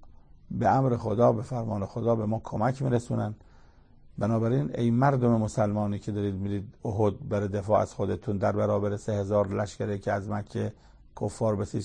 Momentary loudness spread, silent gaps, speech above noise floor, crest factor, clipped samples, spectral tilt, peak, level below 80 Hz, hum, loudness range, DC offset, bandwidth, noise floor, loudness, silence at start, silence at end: 10 LU; none; 27 dB; 18 dB; under 0.1%; -8 dB/octave; -10 dBFS; -52 dBFS; none; 2 LU; under 0.1%; 9.8 kHz; -54 dBFS; -28 LUFS; 0 s; 0 s